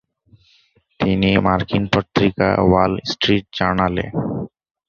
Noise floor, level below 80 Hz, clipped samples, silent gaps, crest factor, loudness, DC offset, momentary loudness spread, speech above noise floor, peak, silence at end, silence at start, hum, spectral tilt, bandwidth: -58 dBFS; -38 dBFS; under 0.1%; none; 18 dB; -18 LUFS; under 0.1%; 8 LU; 40 dB; 0 dBFS; 0.4 s; 1 s; none; -6.5 dB/octave; 7 kHz